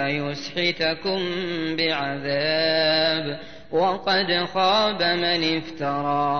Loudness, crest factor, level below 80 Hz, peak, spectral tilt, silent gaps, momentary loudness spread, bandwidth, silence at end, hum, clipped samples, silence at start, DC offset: -22 LUFS; 14 dB; -58 dBFS; -10 dBFS; -5 dB/octave; none; 7 LU; 6.6 kHz; 0 s; none; under 0.1%; 0 s; 0.7%